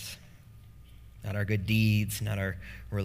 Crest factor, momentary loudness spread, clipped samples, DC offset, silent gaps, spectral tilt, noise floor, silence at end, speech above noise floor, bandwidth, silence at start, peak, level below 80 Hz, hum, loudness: 18 dB; 17 LU; under 0.1%; under 0.1%; none; -5.5 dB/octave; -52 dBFS; 0 s; 23 dB; 16 kHz; 0 s; -14 dBFS; -50 dBFS; none; -30 LUFS